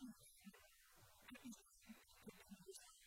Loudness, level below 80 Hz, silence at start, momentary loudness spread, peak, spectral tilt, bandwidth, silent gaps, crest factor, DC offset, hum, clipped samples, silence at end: -63 LUFS; -82 dBFS; 0 s; 9 LU; -44 dBFS; -3.5 dB/octave; 16.5 kHz; none; 18 dB; under 0.1%; none; under 0.1%; 0 s